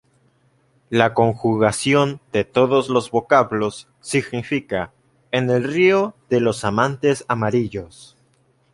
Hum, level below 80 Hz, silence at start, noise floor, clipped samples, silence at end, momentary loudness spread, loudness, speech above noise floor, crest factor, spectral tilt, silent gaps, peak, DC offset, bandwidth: none; -54 dBFS; 0.9 s; -60 dBFS; under 0.1%; 0.7 s; 10 LU; -19 LUFS; 42 dB; 18 dB; -5.5 dB/octave; none; -2 dBFS; under 0.1%; 11.5 kHz